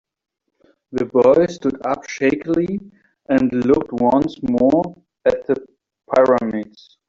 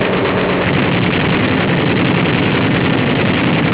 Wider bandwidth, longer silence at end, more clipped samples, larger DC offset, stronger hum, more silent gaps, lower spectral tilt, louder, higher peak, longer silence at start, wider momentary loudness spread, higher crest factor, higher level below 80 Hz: first, 7.6 kHz vs 4 kHz; first, 0.45 s vs 0 s; neither; second, under 0.1% vs 0.3%; neither; neither; second, -7 dB/octave vs -10 dB/octave; second, -18 LUFS vs -14 LUFS; about the same, -2 dBFS vs -2 dBFS; first, 0.9 s vs 0 s; first, 11 LU vs 1 LU; first, 16 dB vs 10 dB; second, -52 dBFS vs -36 dBFS